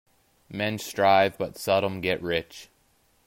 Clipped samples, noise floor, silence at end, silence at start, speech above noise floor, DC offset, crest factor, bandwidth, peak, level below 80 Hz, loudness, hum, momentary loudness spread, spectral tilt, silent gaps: under 0.1%; -65 dBFS; 0.6 s; 0.5 s; 40 dB; under 0.1%; 20 dB; 16.5 kHz; -8 dBFS; -62 dBFS; -25 LUFS; none; 17 LU; -4.5 dB/octave; none